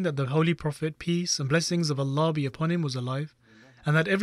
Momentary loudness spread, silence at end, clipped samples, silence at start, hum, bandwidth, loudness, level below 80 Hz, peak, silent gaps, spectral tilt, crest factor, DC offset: 7 LU; 0 s; under 0.1%; 0 s; none; 12.5 kHz; -27 LUFS; -60 dBFS; -12 dBFS; none; -5.5 dB/octave; 14 dB; under 0.1%